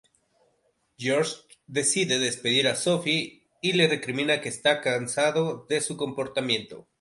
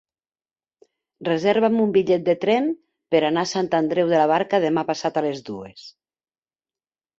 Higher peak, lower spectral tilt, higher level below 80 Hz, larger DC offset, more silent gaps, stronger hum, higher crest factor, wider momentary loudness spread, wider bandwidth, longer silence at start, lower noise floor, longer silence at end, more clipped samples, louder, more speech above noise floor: about the same, -6 dBFS vs -6 dBFS; second, -3 dB/octave vs -5.5 dB/octave; about the same, -70 dBFS vs -66 dBFS; neither; neither; neither; about the same, 20 dB vs 18 dB; second, 8 LU vs 13 LU; first, 11.5 kHz vs 8 kHz; second, 1 s vs 1.2 s; second, -70 dBFS vs under -90 dBFS; second, 0.2 s vs 1.3 s; neither; second, -25 LUFS vs -21 LUFS; second, 44 dB vs over 70 dB